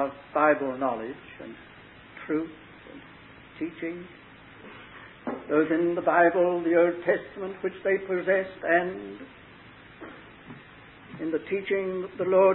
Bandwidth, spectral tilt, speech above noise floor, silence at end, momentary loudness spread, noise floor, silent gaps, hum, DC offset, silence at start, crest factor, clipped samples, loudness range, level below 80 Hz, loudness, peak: 4.2 kHz; -10 dB/octave; 24 dB; 0 s; 24 LU; -49 dBFS; none; none; under 0.1%; 0 s; 20 dB; under 0.1%; 13 LU; -64 dBFS; -26 LUFS; -8 dBFS